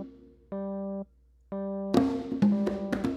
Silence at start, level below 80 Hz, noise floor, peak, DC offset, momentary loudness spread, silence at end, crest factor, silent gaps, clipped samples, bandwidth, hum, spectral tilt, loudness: 0 s; -56 dBFS; -54 dBFS; -10 dBFS; under 0.1%; 15 LU; 0 s; 20 dB; none; under 0.1%; 9.6 kHz; none; -8 dB/octave; -30 LUFS